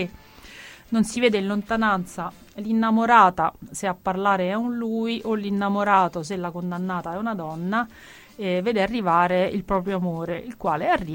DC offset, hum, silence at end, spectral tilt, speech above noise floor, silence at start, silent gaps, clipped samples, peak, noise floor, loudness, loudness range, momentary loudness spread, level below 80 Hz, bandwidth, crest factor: under 0.1%; none; 0 s; -5.5 dB/octave; 22 dB; 0 s; none; under 0.1%; -2 dBFS; -45 dBFS; -23 LUFS; 4 LU; 11 LU; -52 dBFS; 17 kHz; 20 dB